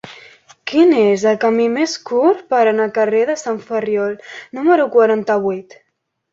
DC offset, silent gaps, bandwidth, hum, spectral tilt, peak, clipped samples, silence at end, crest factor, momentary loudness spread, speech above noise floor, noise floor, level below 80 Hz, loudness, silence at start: under 0.1%; none; 7.8 kHz; none; -5 dB/octave; -2 dBFS; under 0.1%; 0.7 s; 14 dB; 11 LU; 29 dB; -44 dBFS; -64 dBFS; -15 LUFS; 0.05 s